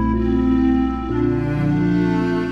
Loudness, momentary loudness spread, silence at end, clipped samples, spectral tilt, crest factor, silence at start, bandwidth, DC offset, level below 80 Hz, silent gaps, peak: -19 LUFS; 3 LU; 0 s; under 0.1%; -9 dB/octave; 12 dB; 0 s; 7 kHz; 0.3%; -30 dBFS; none; -6 dBFS